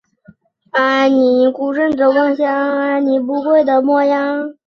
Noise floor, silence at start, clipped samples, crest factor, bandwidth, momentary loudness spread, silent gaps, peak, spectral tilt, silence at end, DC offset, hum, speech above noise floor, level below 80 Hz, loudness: -48 dBFS; 0.75 s; under 0.1%; 12 dB; 6.6 kHz; 5 LU; none; -2 dBFS; -5 dB/octave; 0.15 s; under 0.1%; none; 34 dB; -60 dBFS; -14 LUFS